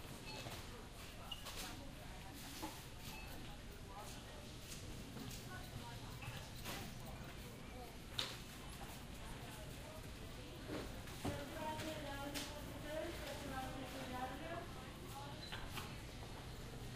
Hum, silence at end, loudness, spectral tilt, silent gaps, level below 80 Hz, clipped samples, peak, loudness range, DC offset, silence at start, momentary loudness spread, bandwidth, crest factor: none; 0 s; -50 LUFS; -4 dB/octave; none; -58 dBFS; under 0.1%; -22 dBFS; 5 LU; under 0.1%; 0 s; 7 LU; 15.5 kHz; 28 dB